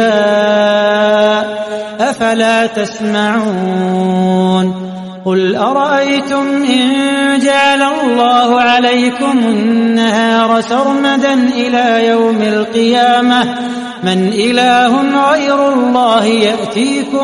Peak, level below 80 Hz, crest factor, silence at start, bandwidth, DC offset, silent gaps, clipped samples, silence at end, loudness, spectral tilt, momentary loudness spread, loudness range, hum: 0 dBFS; -54 dBFS; 10 dB; 0 s; 11.5 kHz; under 0.1%; none; under 0.1%; 0 s; -11 LUFS; -5 dB/octave; 6 LU; 3 LU; none